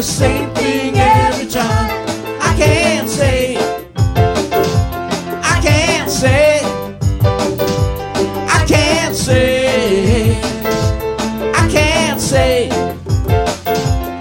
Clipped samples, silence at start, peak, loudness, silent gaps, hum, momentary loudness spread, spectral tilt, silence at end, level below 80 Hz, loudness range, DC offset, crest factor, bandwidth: under 0.1%; 0 s; -2 dBFS; -14 LUFS; none; none; 7 LU; -5 dB/octave; 0 s; -26 dBFS; 1 LU; under 0.1%; 12 dB; 17 kHz